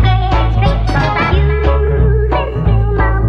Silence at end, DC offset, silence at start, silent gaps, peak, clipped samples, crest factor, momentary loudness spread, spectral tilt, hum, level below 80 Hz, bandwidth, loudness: 0 s; under 0.1%; 0 s; none; -2 dBFS; under 0.1%; 10 dB; 2 LU; -8 dB/octave; none; -14 dBFS; 6.4 kHz; -13 LUFS